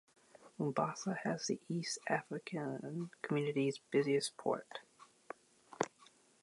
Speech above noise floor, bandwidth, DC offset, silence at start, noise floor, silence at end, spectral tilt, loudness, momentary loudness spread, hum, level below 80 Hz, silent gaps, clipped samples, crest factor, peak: 28 dB; 11.5 kHz; under 0.1%; 0.4 s; -67 dBFS; 0.4 s; -5 dB/octave; -39 LUFS; 17 LU; none; -86 dBFS; none; under 0.1%; 22 dB; -18 dBFS